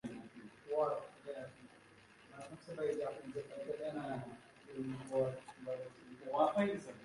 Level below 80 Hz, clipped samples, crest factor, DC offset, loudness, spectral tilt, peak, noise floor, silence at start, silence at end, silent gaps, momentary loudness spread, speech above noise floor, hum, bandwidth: -76 dBFS; under 0.1%; 22 dB; under 0.1%; -41 LUFS; -6.5 dB/octave; -20 dBFS; -63 dBFS; 0.05 s; 0 s; none; 19 LU; 23 dB; none; 11.5 kHz